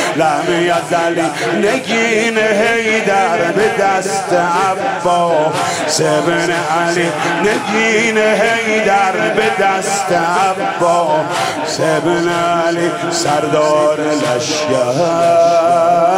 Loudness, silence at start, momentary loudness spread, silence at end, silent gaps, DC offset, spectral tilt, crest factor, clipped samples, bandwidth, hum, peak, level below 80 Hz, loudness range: -13 LUFS; 0 s; 4 LU; 0 s; none; under 0.1%; -4 dB/octave; 10 dB; under 0.1%; 16 kHz; none; -2 dBFS; -54 dBFS; 1 LU